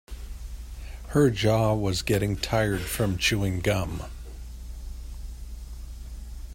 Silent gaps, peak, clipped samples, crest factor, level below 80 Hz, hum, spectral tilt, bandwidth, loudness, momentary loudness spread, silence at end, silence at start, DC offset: none; -8 dBFS; under 0.1%; 20 dB; -38 dBFS; none; -5 dB/octave; 16.5 kHz; -25 LUFS; 19 LU; 0 s; 0.1 s; under 0.1%